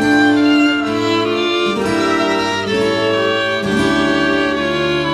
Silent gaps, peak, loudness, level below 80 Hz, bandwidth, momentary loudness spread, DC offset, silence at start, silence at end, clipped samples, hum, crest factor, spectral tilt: none; -2 dBFS; -15 LUFS; -44 dBFS; 13 kHz; 4 LU; under 0.1%; 0 s; 0 s; under 0.1%; none; 12 dB; -4.5 dB/octave